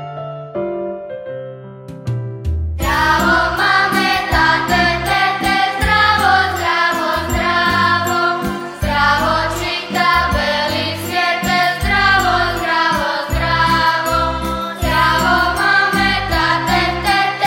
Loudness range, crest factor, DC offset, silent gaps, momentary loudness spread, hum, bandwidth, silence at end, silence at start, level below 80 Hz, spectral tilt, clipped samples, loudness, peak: 3 LU; 14 dB; under 0.1%; none; 11 LU; none; 16.5 kHz; 0 s; 0 s; -30 dBFS; -4 dB/octave; under 0.1%; -15 LUFS; -2 dBFS